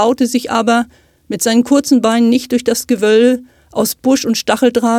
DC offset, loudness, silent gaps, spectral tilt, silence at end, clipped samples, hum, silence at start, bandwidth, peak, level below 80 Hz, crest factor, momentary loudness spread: under 0.1%; -13 LUFS; none; -3.5 dB/octave; 0 s; under 0.1%; none; 0 s; 17 kHz; 0 dBFS; -54 dBFS; 12 dB; 7 LU